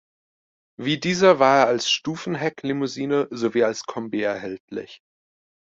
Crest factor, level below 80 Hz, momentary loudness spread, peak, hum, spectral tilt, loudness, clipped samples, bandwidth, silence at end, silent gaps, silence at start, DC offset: 20 dB; -66 dBFS; 15 LU; -4 dBFS; none; -4.5 dB/octave; -22 LUFS; under 0.1%; 7.8 kHz; 0.8 s; 4.60-4.68 s; 0.8 s; under 0.1%